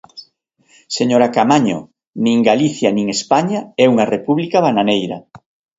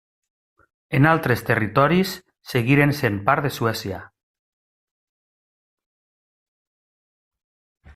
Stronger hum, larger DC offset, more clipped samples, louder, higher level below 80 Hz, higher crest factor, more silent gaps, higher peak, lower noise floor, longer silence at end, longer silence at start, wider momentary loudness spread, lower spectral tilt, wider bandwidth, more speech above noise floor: neither; neither; neither; first, -15 LUFS vs -20 LUFS; about the same, -58 dBFS vs -54 dBFS; second, 16 dB vs 24 dB; first, 2.07-2.13 s vs none; about the same, 0 dBFS vs 0 dBFS; second, -57 dBFS vs under -90 dBFS; second, 0.4 s vs 3.9 s; second, 0.15 s vs 0.9 s; about the same, 10 LU vs 11 LU; second, -5 dB/octave vs -6.5 dB/octave; second, 8 kHz vs 16 kHz; second, 42 dB vs over 70 dB